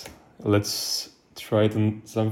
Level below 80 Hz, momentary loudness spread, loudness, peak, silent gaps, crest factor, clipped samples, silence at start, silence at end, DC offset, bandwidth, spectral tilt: -62 dBFS; 16 LU; -25 LUFS; -8 dBFS; none; 16 dB; under 0.1%; 0 s; 0 s; under 0.1%; 16.5 kHz; -5 dB/octave